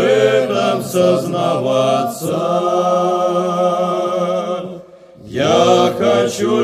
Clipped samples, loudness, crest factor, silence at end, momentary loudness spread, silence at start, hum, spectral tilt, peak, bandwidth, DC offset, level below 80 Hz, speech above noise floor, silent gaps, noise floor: under 0.1%; -15 LUFS; 14 dB; 0 s; 7 LU; 0 s; none; -5 dB/octave; 0 dBFS; 15.5 kHz; under 0.1%; -58 dBFS; 23 dB; none; -38 dBFS